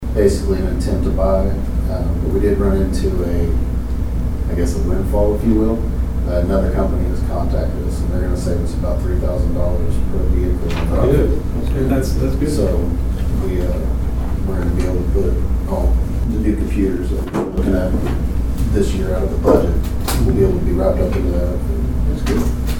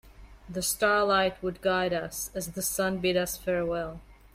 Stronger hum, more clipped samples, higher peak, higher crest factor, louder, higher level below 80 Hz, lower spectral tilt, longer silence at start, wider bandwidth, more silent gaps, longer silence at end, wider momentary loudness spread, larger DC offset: neither; neither; first, 0 dBFS vs -12 dBFS; about the same, 16 dB vs 18 dB; first, -19 LUFS vs -28 LUFS; first, -18 dBFS vs -52 dBFS; first, -7.5 dB/octave vs -3.5 dB/octave; about the same, 0 s vs 0.05 s; about the same, 16.5 kHz vs 16 kHz; neither; second, 0 s vs 0.2 s; second, 5 LU vs 10 LU; neither